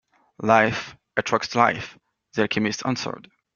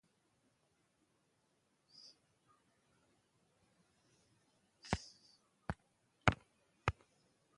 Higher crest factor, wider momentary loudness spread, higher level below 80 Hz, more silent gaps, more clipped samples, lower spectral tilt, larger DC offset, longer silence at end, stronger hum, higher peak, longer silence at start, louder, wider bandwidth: second, 22 dB vs 38 dB; second, 14 LU vs 23 LU; about the same, -60 dBFS vs -60 dBFS; neither; neither; about the same, -4.5 dB/octave vs -5 dB/octave; neither; second, 0.35 s vs 0.65 s; neither; first, -2 dBFS vs -10 dBFS; second, 0.4 s vs 4.85 s; first, -23 LUFS vs -42 LUFS; second, 7.4 kHz vs 11 kHz